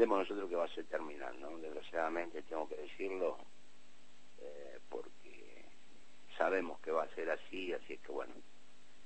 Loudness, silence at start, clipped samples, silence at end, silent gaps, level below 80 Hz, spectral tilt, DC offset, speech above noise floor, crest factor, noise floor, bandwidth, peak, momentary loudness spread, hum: -41 LUFS; 0 s; under 0.1%; 0.65 s; none; -74 dBFS; -4.5 dB/octave; 0.5%; 26 dB; 24 dB; -66 dBFS; 8.4 kHz; -18 dBFS; 19 LU; none